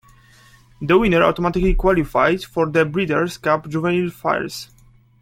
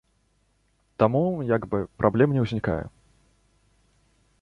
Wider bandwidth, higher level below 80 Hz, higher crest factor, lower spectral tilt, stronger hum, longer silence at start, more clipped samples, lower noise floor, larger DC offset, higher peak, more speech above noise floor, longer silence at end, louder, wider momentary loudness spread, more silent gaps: first, 16 kHz vs 7.4 kHz; first, -32 dBFS vs -50 dBFS; about the same, 18 dB vs 22 dB; second, -6.5 dB/octave vs -9.5 dB/octave; neither; second, 0.8 s vs 1 s; neither; second, -49 dBFS vs -67 dBFS; neither; first, 0 dBFS vs -4 dBFS; second, 31 dB vs 44 dB; second, 0.6 s vs 1.55 s; first, -19 LUFS vs -24 LUFS; second, 7 LU vs 10 LU; neither